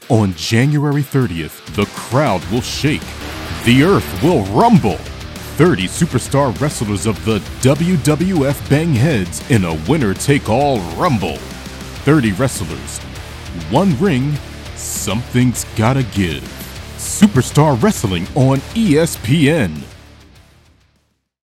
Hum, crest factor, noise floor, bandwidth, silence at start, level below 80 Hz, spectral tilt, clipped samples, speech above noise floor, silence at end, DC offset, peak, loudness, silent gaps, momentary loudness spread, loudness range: none; 16 dB; -62 dBFS; 16 kHz; 0 s; -34 dBFS; -5.5 dB/octave; under 0.1%; 48 dB; 1.45 s; under 0.1%; 0 dBFS; -15 LUFS; none; 14 LU; 3 LU